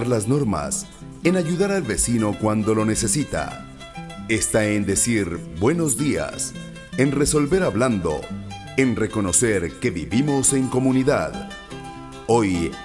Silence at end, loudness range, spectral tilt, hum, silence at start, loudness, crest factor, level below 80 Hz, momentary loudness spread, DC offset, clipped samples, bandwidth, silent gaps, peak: 0 s; 2 LU; -4.5 dB/octave; none; 0 s; -21 LUFS; 18 dB; -42 dBFS; 16 LU; under 0.1%; under 0.1%; 12 kHz; none; -4 dBFS